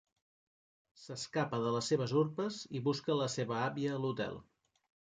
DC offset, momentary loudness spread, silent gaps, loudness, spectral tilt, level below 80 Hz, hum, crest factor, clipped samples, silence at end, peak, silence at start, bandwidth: under 0.1%; 8 LU; none; -36 LUFS; -5.5 dB/octave; -74 dBFS; none; 16 dB; under 0.1%; 0.7 s; -20 dBFS; 1 s; 9.4 kHz